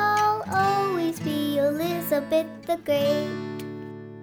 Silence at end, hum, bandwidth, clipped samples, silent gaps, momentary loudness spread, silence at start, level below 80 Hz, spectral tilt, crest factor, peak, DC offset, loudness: 0 s; none; over 20 kHz; under 0.1%; none; 12 LU; 0 s; -64 dBFS; -5.5 dB/octave; 14 dB; -10 dBFS; under 0.1%; -25 LUFS